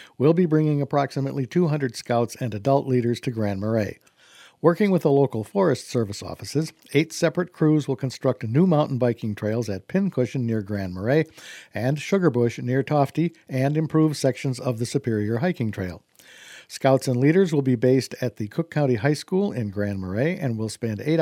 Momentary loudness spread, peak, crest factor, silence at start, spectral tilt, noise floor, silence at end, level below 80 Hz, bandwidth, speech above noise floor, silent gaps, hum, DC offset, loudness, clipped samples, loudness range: 8 LU; -2 dBFS; 20 dB; 0 s; -7 dB/octave; -52 dBFS; 0 s; -64 dBFS; 15.5 kHz; 29 dB; none; none; under 0.1%; -23 LUFS; under 0.1%; 2 LU